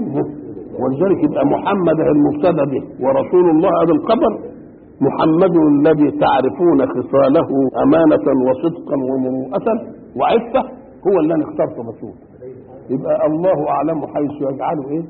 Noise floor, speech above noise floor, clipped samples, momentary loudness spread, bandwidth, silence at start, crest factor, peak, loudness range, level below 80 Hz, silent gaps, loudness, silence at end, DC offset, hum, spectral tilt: -38 dBFS; 23 dB; under 0.1%; 12 LU; 4.5 kHz; 0 s; 12 dB; -2 dBFS; 6 LU; -50 dBFS; none; -16 LUFS; 0 s; under 0.1%; none; -12.5 dB/octave